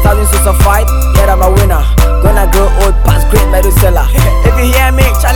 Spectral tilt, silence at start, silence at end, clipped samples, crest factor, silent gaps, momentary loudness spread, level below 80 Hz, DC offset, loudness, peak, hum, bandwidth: -5 dB/octave; 0 s; 0 s; 1%; 6 dB; none; 2 LU; -8 dBFS; under 0.1%; -9 LUFS; 0 dBFS; none; 19.5 kHz